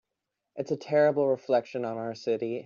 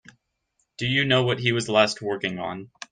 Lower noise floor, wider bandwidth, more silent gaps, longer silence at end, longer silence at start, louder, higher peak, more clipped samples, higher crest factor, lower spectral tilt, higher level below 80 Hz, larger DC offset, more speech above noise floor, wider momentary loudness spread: first, -85 dBFS vs -73 dBFS; second, 7.2 kHz vs 9.6 kHz; neither; second, 0 s vs 0.25 s; second, 0.55 s vs 0.8 s; second, -28 LUFS vs -23 LUFS; second, -12 dBFS vs -4 dBFS; neither; second, 16 dB vs 22 dB; about the same, -5.5 dB/octave vs -4.5 dB/octave; second, -78 dBFS vs -62 dBFS; neither; first, 58 dB vs 50 dB; about the same, 10 LU vs 12 LU